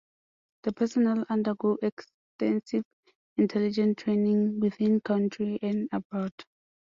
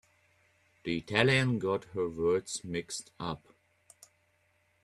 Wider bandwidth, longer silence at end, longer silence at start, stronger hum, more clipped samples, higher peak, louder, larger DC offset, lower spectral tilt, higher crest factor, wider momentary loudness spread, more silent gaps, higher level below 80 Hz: second, 7.4 kHz vs 12.5 kHz; second, 0.5 s vs 1.45 s; second, 0.65 s vs 0.85 s; neither; neither; second, -14 dBFS vs -8 dBFS; first, -28 LUFS vs -31 LUFS; neither; first, -8 dB/octave vs -5 dB/octave; second, 14 dB vs 26 dB; second, 9 LU vs 14 LU; first, 1.92-1.97 s, 2.14-2.39 s, 2.85-3.03 s, 3.15-3.36 s, 6.05-6.10 s, 6.32-6.38 s vs none; second, -70 dBFS vs -64 dBFS